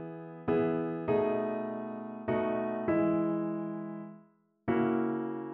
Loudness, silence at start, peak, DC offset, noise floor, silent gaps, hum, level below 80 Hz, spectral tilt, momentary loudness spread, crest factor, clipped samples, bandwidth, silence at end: -32 LUFS; 0 s; -18 dBFS; under 0.1%; -63 dBFS; none; none; -66 dBFS; -7.5 dB/octave; 11 LU; 14 dB; under 0.1%; 4.1 kHz; 0 s